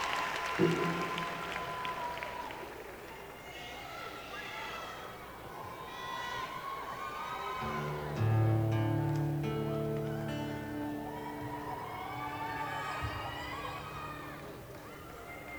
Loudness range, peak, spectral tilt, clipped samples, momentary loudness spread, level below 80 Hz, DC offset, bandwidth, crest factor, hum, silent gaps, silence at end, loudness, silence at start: 9 LU; -16 dBFS; -6 dB/octave; under 0.1%; 15 LU; -58 dBFS; under 0.1%; over 20 kHz; 20 dB; none; none; 0 s; -37 LUFS; 0 s